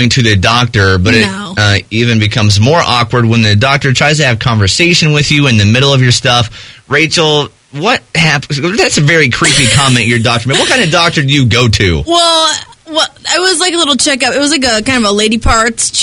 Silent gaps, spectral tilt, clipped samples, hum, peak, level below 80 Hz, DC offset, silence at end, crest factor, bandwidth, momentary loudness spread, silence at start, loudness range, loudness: none; -4 dB/octave; 0.5%; none; 0 dBFS; -30 dBFS; under 0.1%; 0 s; 10 dB; 11 kHz; 5 LU; 0 s; 2 LU; -8 LUFS